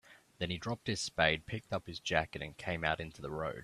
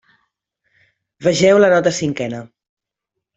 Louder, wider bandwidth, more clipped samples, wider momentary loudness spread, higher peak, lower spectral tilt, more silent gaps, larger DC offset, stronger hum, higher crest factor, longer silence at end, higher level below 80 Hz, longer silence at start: second, -36 LUFS vs -15 LUFS; first, 14 kHz vs 8.2 kHz; neither; second, 11 LU vs 14 LU; second, -12 dBFS vs -2 dBFS; about the same, -4 dB/octave vs -5 dB/octave; neither; neither; neither; first, 26 dB vs 16 dB; second, 0 s vs 0.9 s; about the same, -58 dBFS vs -56 dBFS; second, 0.1 s vs 1.2 s